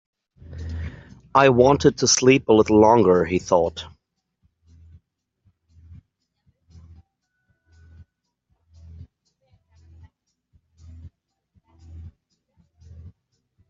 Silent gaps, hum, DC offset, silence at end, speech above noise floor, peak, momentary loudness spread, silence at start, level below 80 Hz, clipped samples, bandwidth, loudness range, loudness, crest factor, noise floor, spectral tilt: none; none; under 0.1%; 0.6 s; 55 dB; -2 dBFS; 22 LU; 0.5 s; -50 dBFS; under 0.1%; 7.8 kHz; 11 LU; -17 LUFS; 22 dB; -71 dBFS; -4.5 dB/octave